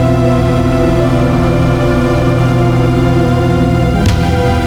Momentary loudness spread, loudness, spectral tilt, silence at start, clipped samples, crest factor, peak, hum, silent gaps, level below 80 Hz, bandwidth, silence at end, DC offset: 1 LU; -11 LUFS; -7.5 dB/octave; 0 s; under 0.1%; 8 dB; -2 dBFS; none; none; -20 dBFS; 14 kHz; 0 s; under 0.1%